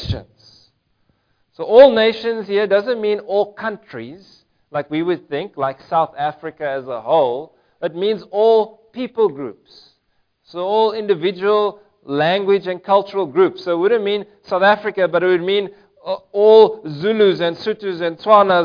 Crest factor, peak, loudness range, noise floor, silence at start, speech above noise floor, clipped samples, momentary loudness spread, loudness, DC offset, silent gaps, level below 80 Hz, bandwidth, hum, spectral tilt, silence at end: 18 dB; 0 dBFS; 6 LU; -65 dBFS; 0 s; 49 dB; under 0.1%; 15 LU; -17 LUFS; under 0.1%; none; -50 dBFS; 5.2 kHz; none; -7 dB/octave; 0 s